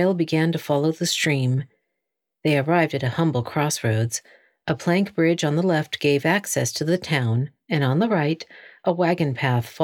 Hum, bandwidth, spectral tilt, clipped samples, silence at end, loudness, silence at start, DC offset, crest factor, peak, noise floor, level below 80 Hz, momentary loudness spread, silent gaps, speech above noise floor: none; 17.5 kHz; -5.5 dB/octave; under 0.1%; 0 s; -22 LUFS; 0 s; under 0.1%; 18 dB; -4 dBFS; -82 dBFS; -64 dBFS; 7 LU; none; 61 dB